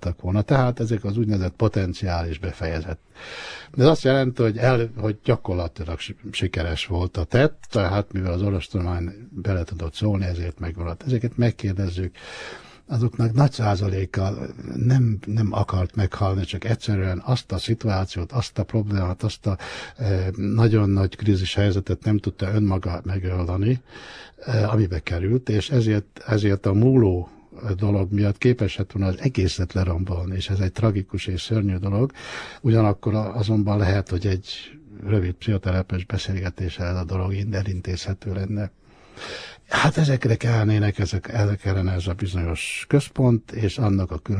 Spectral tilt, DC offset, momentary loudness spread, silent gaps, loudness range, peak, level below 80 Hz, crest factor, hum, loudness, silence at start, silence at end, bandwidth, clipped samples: -7 dB/octave; under 0.1%; 11 LU; none; 4 LU; -4 dBFS; -40 dBFS; 18 dB; none; -23 LUFS; 0 s; 0 s; 10.5 kHz; under 0.1%